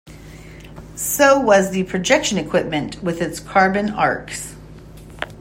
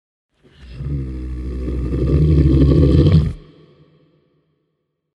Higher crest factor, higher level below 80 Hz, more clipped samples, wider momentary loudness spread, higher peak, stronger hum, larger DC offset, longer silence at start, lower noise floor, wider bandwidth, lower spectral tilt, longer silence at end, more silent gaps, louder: about the same, 18 dB vs 16 dB; second, -44 dBFS vs -24 dBFS; neither; first, 21 LU vs 15 LU; about the same, -2 dBFS vs -2 dBFS; neither; neither; second, 0.05 s vs 0.6 s; second, -39 dBFS vs -72 dBFS; first, 16 kHz vs 5.6 kHz; second, -4 dB/octave vs -10 dB/octave; second, 0 s vs 1.75 s; neither; about the same, -18 LUFS vs -16 LUFS